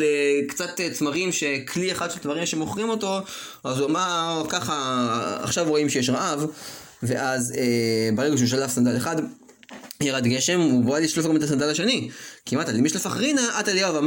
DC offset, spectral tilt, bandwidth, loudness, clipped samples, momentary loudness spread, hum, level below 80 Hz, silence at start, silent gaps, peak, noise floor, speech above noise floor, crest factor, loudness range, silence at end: under 0.1%; -4 dB/octave; 17 kHz; -23 LUFS; under 0.1%; 8 LU; none; -62 dBFS; 0 s; none; -8 dBFS; -44 dBFS; 21 dB; 16 dB; 3 LU; 0 s